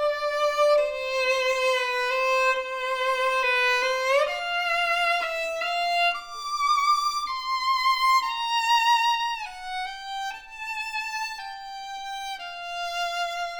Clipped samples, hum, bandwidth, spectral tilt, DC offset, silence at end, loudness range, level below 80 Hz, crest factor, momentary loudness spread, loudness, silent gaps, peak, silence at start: under 0.1%; none; over 20 kHz; 1.5 dB/octave; under 0.1%; 0 s; 8 LU; -58 dBFS; 14 dB; 12 LU; -24 LUFS; none; -12 dBFS; 0 s